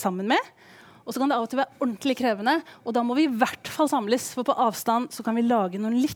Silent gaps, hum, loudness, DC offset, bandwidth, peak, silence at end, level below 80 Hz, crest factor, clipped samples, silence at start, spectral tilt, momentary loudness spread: none; none; -25 LUFS; under 0.1%; over 20 kHz; -6 dBFS; 0 s; -72 dBFS; 18 dB; under 0.1%; 0 s; -4.5 dB/octave; 5 LU